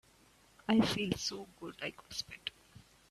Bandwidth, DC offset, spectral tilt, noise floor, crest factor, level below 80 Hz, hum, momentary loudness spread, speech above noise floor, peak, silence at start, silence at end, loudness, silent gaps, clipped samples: 13.5 kHz; under 0.1%; -4 dB/octave; -65 dBFS; 22 dB; -64 dBFS; none; 16 LU; 30 dB; -16 dBFS; 0.7 s; 0.3 s; -36 LUFS; none; under 0.1%